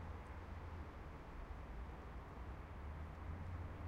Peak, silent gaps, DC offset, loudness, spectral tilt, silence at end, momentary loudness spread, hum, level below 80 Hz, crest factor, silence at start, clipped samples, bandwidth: -36 dBFS; none; under 0.1%; -53 LUFS; -7.5 dB/octave; 0 s; 4 LU; none; -54 dBFS; 14 dB; 0 s; under 0.1%; 11 kHz